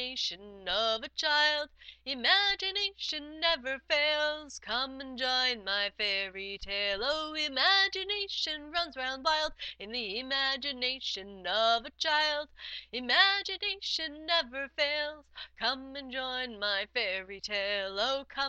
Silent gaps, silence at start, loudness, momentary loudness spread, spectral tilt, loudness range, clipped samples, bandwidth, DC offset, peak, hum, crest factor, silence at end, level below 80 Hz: none; 0 s; -30 LUFS; 11 LU; -1 dB/octave; 4 LU; under 0.1%; 8.8 kHz; under 0.1%; -8 dBFS; none; 24 dB; 0 s; -60 dBFS